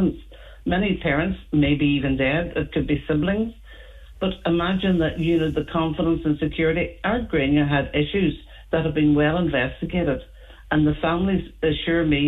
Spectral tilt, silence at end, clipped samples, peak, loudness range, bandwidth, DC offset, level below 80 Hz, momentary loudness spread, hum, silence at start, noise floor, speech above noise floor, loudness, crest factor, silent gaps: -8.5 dB/octave; 0 s; under 0.1%; -6 dBFS; 2 LU; 4.1 kHz; under 0.1%; -38 dBFS; 6 LU; none; 0 s; -42 dBFS; 21 dB; -22 LUFS; 16 dB; none